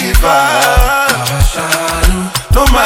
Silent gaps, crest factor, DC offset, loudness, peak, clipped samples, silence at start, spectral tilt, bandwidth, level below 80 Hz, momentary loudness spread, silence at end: none; 10 dB; under 0.1%; -11 LUFS; 0 dBFS; 0.4%; 0 s; -3.5 dB/octave; over 20 kHz; -14 dBFS; 4 LU; 0 s